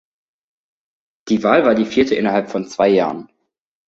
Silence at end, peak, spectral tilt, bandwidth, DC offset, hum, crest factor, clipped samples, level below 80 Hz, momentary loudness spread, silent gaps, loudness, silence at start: 0.65 s; -2 dBFS; -6 dB/octave; 7.8 kHz; under 0.1%; none; 18 dB; under 0.1%; -56 dBFS; 10 LU; none; -16 LUFS; 1.25 s